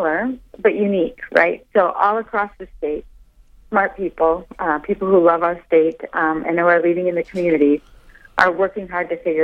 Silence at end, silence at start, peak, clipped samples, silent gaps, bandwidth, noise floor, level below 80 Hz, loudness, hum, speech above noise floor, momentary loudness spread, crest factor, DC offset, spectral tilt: 0 s; 0 s; 0 dBFS; under 0.1%; none; 8 kHz; -48 dBFS; -48 dBFS; -18 LUFS; none; 30 dB; 9 LU; 18 dB; under 0.1%; -7.5 dB/octave